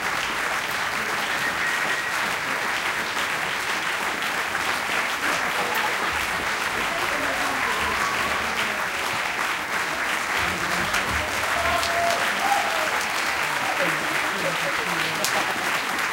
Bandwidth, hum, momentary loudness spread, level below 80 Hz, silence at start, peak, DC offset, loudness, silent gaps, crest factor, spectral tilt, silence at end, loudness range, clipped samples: 17 kHz; none; 3 LU; -50 dBFS; 0 s; -2 dBFS; under 0.1%; -23 LUFS; none; 22 dB; -1.5 dB/octave; 0 s; 1 LU; under 0.1%